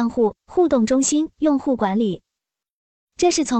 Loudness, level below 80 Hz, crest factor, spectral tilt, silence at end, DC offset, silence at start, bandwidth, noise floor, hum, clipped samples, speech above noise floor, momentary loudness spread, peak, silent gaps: -20 LUFS; -52 dBFS; 14 dB; -4.5 dB/octave; 0 s; under 0.1%; 0 s; 9.6 kHz; -85 dBFS; none; under 0.1%; 67 dB; 5 LU; -6 dBFS; 2.70-3.08 s